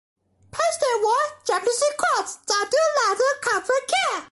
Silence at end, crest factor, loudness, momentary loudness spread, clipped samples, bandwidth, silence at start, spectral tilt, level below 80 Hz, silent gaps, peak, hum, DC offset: 0.05 s; 16 dB; -22 LUFS; 4 LU; under 0.1%; 12 kHz; 0.55 s; 0 dB/octave; -66 dBFS; none; -6 dBFS; none; under 0.1%